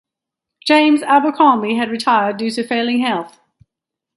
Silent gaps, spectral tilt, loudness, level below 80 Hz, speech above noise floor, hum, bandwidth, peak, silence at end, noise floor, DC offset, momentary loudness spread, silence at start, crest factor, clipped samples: none; -4.5 dB/octave; -15 LUFS; -66 dBFS; 68 dB; none; 11.5 kHz; 0 dBFS; 0.9 s; -83 dBFS; under 0.1%; 10 LU; 0.65 s; 16 dB; under 0.1%